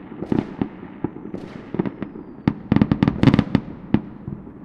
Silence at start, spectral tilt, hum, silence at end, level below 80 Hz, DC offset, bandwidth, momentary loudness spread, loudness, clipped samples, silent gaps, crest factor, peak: 0 s; -9 dB/octave; none; 0 s; -42 dBFS; under 0.1%; 7.8 kHz; 17 LU; -22 LUFS; under 0.1%; none; 22 dB; -2 dBFS